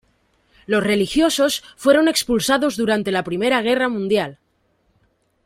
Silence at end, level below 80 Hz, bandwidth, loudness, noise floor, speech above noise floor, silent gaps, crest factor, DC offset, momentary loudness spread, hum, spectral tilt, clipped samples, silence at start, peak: 1.1 s; -52 dBFS; 16 kHz; -18 LUFS; -64 dBFS; 46 dB; none; 18 dB; under 0.1%; 6 LU; none; -4 dB/octave; under 0.1%; 0.7 s; -2 dBFS